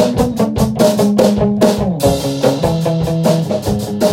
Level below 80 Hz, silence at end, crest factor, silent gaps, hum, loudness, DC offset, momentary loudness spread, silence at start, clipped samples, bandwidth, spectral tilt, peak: -34 dBFS; 0 s; 14 dB; none; none; -14 LUFS; under 0.1%; 4 LU; 0 s; under 0.1%; 17 kHz; -6.5 dB/octave; 0 dBFS